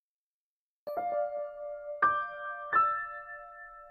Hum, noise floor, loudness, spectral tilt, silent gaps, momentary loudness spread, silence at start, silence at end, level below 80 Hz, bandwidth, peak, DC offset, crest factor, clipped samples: none; under -90 dBFS; -32 LUFS; -6 dB/octave; none; 18 LU; 0.85 s; 0 s; -70 dBFS; 12.5 kHz; -14 dBFS; under 0.1%; 20 dB; under 0.1%